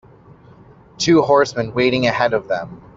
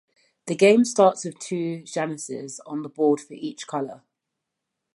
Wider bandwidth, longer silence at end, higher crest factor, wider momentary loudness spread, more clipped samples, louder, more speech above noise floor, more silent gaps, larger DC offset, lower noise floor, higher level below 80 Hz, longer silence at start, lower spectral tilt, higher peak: second, 7.8 kHz vs 11.5 kHz; second, 0.2 s vs 1 s; about the same, 16 dB vs 20 dB; second, 9 LU vs 17 LU; neither; first, -17 LUFS vs -23 LUFS; second, 29 dB vs 60 dB; neither; neither; second, -45 dBFS vs -83 dBFS; first, -52 dBFS vs -78 dBFS; first, 1 s vs 0.45 s; about the same, -5 dB/octave vs -5 dB/octave; about the same, -2 dBFS vs -4 dBFS